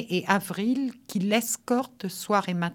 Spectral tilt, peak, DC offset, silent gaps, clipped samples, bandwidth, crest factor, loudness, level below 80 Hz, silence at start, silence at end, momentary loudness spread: -4.5 dB/octave; -6 dBFS; under 0.1%; none; under 0.1%; 19 kHz; 20 dB; -27 LUFS; -76 dBFS; 0 s; 0 s; 6 LU